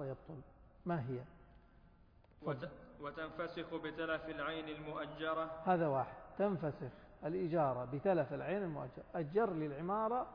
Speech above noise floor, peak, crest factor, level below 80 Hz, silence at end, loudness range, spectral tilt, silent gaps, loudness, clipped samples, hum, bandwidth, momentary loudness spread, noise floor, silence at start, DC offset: 26 dB; -22 dBFS; 18 dB; -66 dBFS; 0 s; 8 LU; -5.5 dB/octave; none; -40 LUFS; under 0.1%; none; 5.2 kHz; 13 LU; -65 dBFS; 0 s; under 0.1%